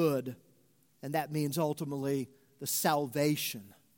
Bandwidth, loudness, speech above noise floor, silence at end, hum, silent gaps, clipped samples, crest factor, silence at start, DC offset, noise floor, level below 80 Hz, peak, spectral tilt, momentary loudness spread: 17 kHz; -33 LUFS; 36 dB; 0.25 s; none; none; under 0.1%; 20 dB; 0 s; under 0.1%; -69 dBFS; -76 dBFS; -14 dBFS; -4.5 dB/octave; 16 LU